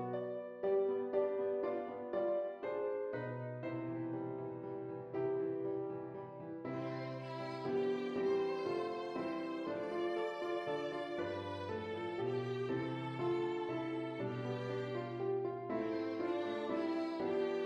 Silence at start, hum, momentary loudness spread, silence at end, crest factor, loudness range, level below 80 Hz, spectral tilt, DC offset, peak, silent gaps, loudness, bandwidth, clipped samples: 0 s; none; 7 LU; 0 s; 16 dB; 3 LU; -80 dBFS; -7.5 dB/octave; under 0.1%; -24 dBFS; none; -40 LUFS; 7.6 kHz; under 0.1%